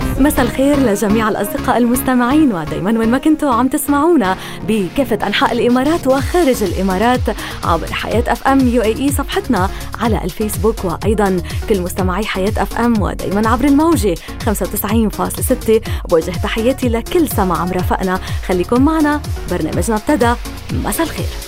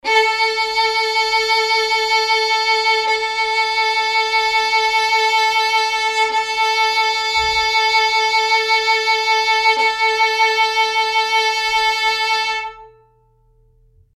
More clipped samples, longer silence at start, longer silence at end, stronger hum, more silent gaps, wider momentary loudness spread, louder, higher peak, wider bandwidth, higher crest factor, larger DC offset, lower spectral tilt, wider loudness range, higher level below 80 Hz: neither; about the same, 0 s vs 0.05 s; second, 0 s vs 1.3 s; neither; neither; first, 6 LU vs 3 LU; about the same, -15 LUFS vs -15 LUFS; first, 0 dBFS vs -4 dBFS; about the same, 16.5 kHz vs 15.5 kHz; about the same, 14 dB vs 14 dB; neither; first, -5.5 dB/octave vs 1.5 dB/octave; about the same, 3 LU vs 2 LU; first, -26 dBFS vs -50 dBFS